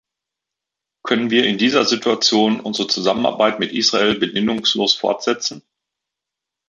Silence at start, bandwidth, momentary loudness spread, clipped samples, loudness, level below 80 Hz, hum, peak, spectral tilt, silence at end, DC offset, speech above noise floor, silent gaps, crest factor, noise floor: 1.05 s; 7.6 kHz; 6 LU; under 0.1%; -17 LUFS; -62 dBFS; none; -2 dBFS; -3 dB/octave; 1.1 s; under 0.1%; 67 dB; none; 18 dB; -84 dBFS